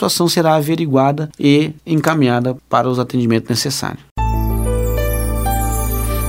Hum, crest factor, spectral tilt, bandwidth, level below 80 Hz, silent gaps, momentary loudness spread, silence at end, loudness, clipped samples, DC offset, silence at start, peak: none; 16 dB; -5.5 dB/octave; 16.5 kHz; -24 dBFS; 4.11-4.16 s; 6 LU; 0 s; -16 LUFS; under 0.1%; under 0.1%; 0 s; 0 dBFS